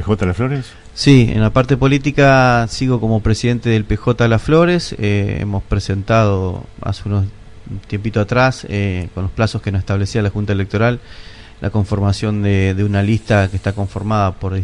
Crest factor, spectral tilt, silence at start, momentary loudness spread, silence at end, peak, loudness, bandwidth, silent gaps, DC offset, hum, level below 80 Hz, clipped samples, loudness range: 16 dB; -7 dB/octave; 0 s; 11 LU; 0 s; 0 dBFS; -16 LUFS; 10.5 kHz; none; under 0.1%; none; -32 dBFS; under 0.1%; 6 LU